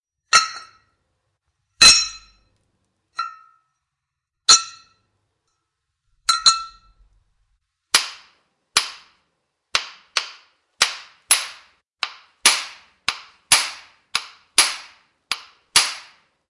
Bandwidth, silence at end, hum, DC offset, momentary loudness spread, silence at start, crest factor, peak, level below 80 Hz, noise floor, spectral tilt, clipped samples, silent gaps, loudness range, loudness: 11.5 kHz; 0.5 s; none; under 0.1%; 20 LU; 0.35 s; 24 dB; 0 dBFS; -56 dBFS; -81 dBFS; 2.5 dB/octave; under 0.1%; none; 6 LU; -17 LUFS